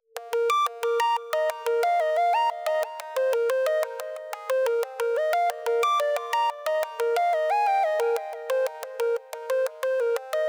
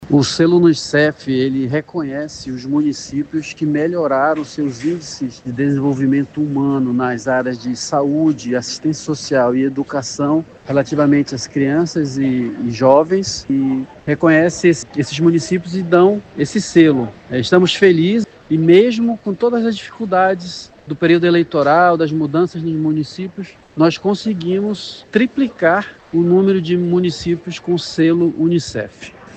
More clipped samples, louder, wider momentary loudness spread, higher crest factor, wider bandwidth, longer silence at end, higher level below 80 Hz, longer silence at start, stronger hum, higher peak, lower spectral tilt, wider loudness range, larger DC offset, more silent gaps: neither; second, -25 LUFS vs -16 LUFS; second, 6 LU vs 10 LU; about the same, 20 dB vs 16 dB; first, over 20 kHz vs 8.8 kHz; about the same, 0 s vs 0 s; second, under -90 dBFS vs -52 dBFS; first, 0.15 s vs 0 s; neither; second, -6 dBFS vs 0 dBFS; second, 3 dB/octave vs -6 dB/octave; second, 1 LU vs 4 LU; neither; neither